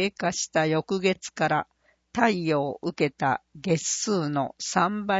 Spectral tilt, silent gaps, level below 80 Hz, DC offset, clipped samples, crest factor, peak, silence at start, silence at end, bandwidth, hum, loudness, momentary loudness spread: -4 dB/octave; none; -64 dBFS; under 0.1%; under 0.1%; 22 dB; -4 dBFS; 0 s; 0 s; 8 kHz; none; -26 LUFS; 5 LU